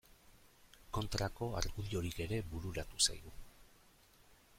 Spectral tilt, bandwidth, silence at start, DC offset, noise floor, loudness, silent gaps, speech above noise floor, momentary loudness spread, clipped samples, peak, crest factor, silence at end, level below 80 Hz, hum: -3.5 dB/octave; 16.5 kHz; 0.1 s; under 0.1%; -66 dBFS; -39 LUFS; none; 27 dB; 11 LU; under 0.1%; -18 dBFS; 24 dB; 0.25 s; -52 dBFS; none